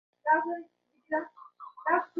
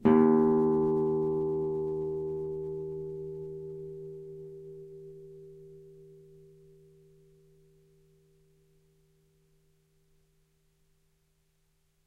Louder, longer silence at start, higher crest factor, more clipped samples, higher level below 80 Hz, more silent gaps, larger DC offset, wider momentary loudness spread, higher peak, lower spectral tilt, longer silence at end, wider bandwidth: about the same, -31 LUFS vs -30 LUFS; first, 0.25 s vs 0 s; about the same, 20 dB vs 24 dB; neither; second, -86 dBFS vs -64 dBFS; neither; neither; second, 20 LU vs 25 LU; second, -12 dBFS vs -8 dBFS; second, -7 dB/octave vs -10.5 dB/octave; second, 0 s vs 6 s; first, 4.6 kHz vs 3.2 kHz